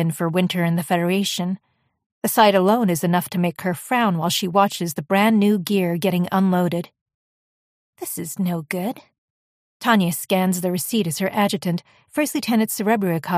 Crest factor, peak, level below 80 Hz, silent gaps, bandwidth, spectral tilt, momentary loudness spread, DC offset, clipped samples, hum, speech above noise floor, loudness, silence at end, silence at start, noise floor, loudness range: 18 dB; -2 dBFS; -66 dBFS; 2.06-2.22 s, 7.01-7.06 s, 7.14-7.93 s, 9.18-9.80 s; 15.5 kHz; -5 dB/octave; 11 LU; under 0.1%; under 0.1%; none; over 70 dB; -20 LUFS; 0 s; 0 s; under -90 dBFS; 6 LU